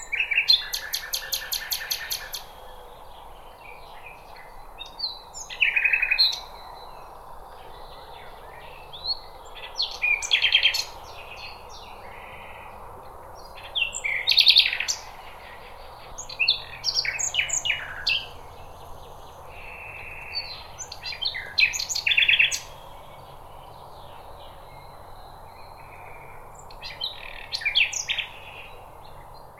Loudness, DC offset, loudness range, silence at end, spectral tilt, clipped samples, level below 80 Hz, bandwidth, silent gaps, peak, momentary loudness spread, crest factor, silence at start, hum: -22 LUFS; under 0.1%; 15 LU; 0 s; 1 dB/octave; under 0.1%; -48 dBFS; 17 kHz; none; -4 dBFS; 26 LU; 26 dB; 0 s; none